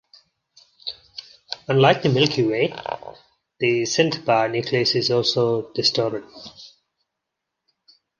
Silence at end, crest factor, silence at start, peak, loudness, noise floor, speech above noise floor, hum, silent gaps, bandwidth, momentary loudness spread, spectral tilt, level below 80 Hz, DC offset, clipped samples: 1.55 s; 22 dB; 0.85 s; -2 dBFS; -20 LUFS; -82 dBFS; 61 dB; none; none; 10 kHz; 20 LU; -4.5 dB/octave; -62 dBFS; under 0.1%; under 0.1%